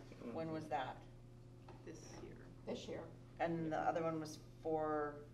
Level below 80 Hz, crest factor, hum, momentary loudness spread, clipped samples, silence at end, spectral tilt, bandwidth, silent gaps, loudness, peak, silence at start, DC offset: -66 dBFS; 18 dB; none; 17 LU; under 0.1%; 0 s; -6 dB/octave; 13 kHz; none; -44 LUFS; -26 dBFS; 0 s; under 0.1%